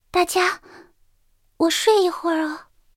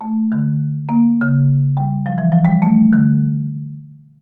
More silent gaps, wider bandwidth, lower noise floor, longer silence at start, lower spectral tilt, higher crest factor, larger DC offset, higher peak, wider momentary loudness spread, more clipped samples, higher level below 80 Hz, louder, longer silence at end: neither; first, 17 kHz vs 2.7 kHz; first, -61 dBFS vs -36 dBFS; first, 0.15 s vs 0 s; second, -1.5 dB/octave vs -12.5 dB/octave; first, 18 dB vs 12 dB; neither; about the same, -4 dBFS vs -2 dBFS; about the same, 13 LU vs 11 LU; neither; second, -58 dBFS vs -52 dBFS; second, -20 LUFS vs -15 LUFS; about the same, 0.35 s vs 0.25 s